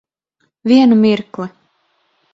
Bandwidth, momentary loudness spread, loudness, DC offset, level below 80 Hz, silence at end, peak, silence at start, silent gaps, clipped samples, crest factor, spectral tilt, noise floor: 7.6 kHz; 18 LU; -12 LUFS; under 0.1%; -60 dBFS; 0.85 s; 0 dBFS; 0.65 s; none; under 0.1%; 16 dB; -7 dB/octave; -66 dBFS